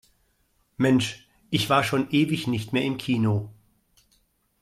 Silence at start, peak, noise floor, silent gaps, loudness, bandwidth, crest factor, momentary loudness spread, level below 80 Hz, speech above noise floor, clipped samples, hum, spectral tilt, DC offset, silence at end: 0.8 s; -6 dBFS; -68 dBFS; none; -24 LUFS; 15.5 kHz; 20 dB; 8 LU; -60 dBFS; 45 dB; under 0.1%; none; -5.5 dB/octave; under 0.1%; 1.1 s